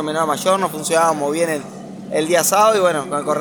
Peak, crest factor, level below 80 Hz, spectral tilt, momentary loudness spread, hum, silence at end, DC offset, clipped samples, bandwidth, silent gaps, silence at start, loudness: -2 dBFS; 16 dB; -68 dBFS; -3.5 dB/octave; 11 LU; none; 0 s; under 0.1%; under 0.1%; over 20 kHz; none; 0 s; -17 LUFS